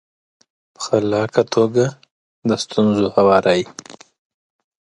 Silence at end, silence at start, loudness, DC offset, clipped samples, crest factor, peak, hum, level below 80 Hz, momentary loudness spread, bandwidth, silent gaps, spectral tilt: 0.9 s; 0.8 s; -17 LUFS; under 0.1%; under 0.1%; 18 dB; 0 dBFS; none; -56 dBFS; 12 LU; 11 kHz; 2.11-2.42 s; -5.5 dB/octave